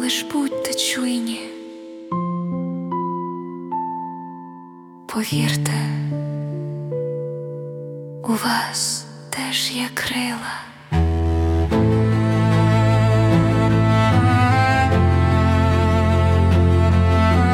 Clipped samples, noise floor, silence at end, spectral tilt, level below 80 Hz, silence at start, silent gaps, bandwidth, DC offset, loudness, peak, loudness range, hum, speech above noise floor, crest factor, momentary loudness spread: under 0.1%; -41 dBFS; 0 s; -5.5 dB/octave; -36 dBFS; 0 s; none; 16.5 kHz; under 0.1%; -19 LUFS; -4 dBFS; 10 LU; none; 18 dB; 14 dB; 14 LU